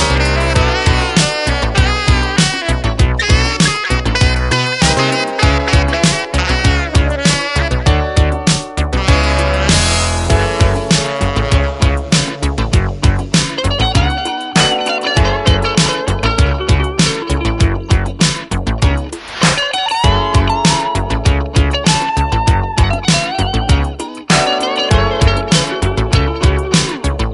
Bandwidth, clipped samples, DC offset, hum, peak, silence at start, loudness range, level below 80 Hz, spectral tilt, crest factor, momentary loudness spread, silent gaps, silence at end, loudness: 11.5 kHz; under 0.1%; under 0.1%; none; 0 dBFS; 0 s; 1 LU; -18 dBFS; -4.5 dB/octave; 14 dB; 4 LU; none; 0 s; -14 LUFS